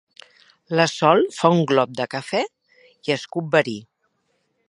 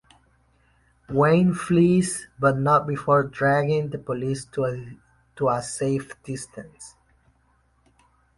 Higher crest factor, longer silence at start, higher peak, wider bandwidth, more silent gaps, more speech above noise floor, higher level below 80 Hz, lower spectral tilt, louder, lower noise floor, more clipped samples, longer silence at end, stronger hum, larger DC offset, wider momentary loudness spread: about the same, 22 dB vs 20 dB; second, 0.7 s vs 1.1 s; first, 0 dBFS vs -6 dBFS; about the same, 11.5 kHz vs 11.5 kHz; neither; first, 50 dB vs 41 dB; second, -70 dBFS vs -56 dBFS; about the same, -5.5 dB/octave vs -6.5 dB/octave; about the same, -21 LUFS vs -23 LUFS; first, -70 dBFS vs -64 dBFS; neither; second, 0.9 s vs 1.5 s; neither; neither; second, 12 LU vs 18 LU